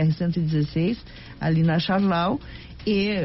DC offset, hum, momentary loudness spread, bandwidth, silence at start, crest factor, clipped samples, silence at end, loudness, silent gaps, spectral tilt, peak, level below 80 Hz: under 0.1%; none; 11 LU; 6 kHz; 0 s; 12 dB; under 0.1%; 0 s; -24 LUFS; none; -6 dB/octave; -12 dBFS; -46 dBFS